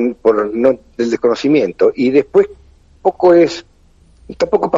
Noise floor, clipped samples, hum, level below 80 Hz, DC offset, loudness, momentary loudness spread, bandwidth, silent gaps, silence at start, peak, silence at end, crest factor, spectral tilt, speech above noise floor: -48 dBFS; under 0.1%; none; -48 dBFS; under 0.1%; -14 LUFS; 9 LU; 7.8 kHz; none; 0 s; 0 dBFS; 0 s; 14 dB; -6 dB/octave; 35 dB